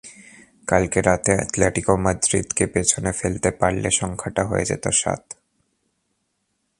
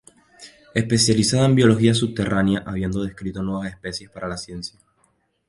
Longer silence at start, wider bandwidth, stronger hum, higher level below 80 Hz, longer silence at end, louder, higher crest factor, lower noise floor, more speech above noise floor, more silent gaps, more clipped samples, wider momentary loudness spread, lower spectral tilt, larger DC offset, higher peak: second, 0.05 s vs 0.4 s; about the same, 11.5 kHz vs 11.5 kHz; neither; first, -40 dBFS vs -46 dBFS; first, 1.45 s vs 0.8 s; about the same, -21 LUFS vs -21 LUFS; about the same, 22 dB vs 20 dB; first, -73 dBFS vs -65 dBFS; first, 52 dB vs 45 dB; neither; neither; second, 7 LU vs 15 LU; about the same, -4 dB/octave vs -5 dB/octave; neither; about the same, 0 dBFS vs -2 dBFS